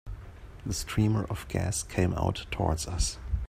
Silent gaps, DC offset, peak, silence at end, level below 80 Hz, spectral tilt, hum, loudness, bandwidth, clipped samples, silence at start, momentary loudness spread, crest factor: none; under 0.1%; -10 dBFS; 0 s; -38 dBFS; -5 dB/octave; none; -30 LUFS; 15.5 kHz; under 0.1%; 0.05 s; 14 LU; 20 dB